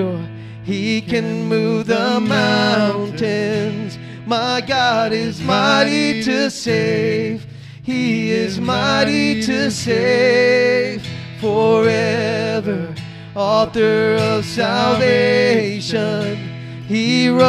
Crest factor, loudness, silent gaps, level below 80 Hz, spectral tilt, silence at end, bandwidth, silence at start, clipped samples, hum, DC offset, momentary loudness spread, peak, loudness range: 16 dB; -17 LUFS; none; -54 dBFS; -5 dB/octave; 0 s; 13 kHz; 0 s; under 0.1%; none; under 0.1%; 11 LU; 0 dBFS; 2 LU